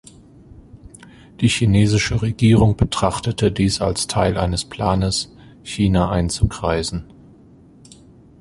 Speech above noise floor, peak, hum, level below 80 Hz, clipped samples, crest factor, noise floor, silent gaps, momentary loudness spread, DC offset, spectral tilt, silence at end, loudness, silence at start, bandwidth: 29 dB; -2 dBFS; none; -34 dBFS; under 0.1%; 18 dB; -47 dBFS; none; 8 LU; under 0.1%; -5.5 dB/octave; 1.35 s; -19 LUFS; 0.75 s; 11.5 kHz